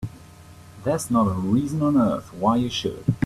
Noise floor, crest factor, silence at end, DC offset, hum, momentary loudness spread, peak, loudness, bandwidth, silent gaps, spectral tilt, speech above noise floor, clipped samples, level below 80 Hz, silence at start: -45 dBFS; 18 dB; 0 s; under 0.1%; none; 6 LU; -6 dBFS; -23 LUFS; 13.5 kHz; none; -6.5 dB/octave; 24 dB; under 0.1%; -50 dBFS; 0 s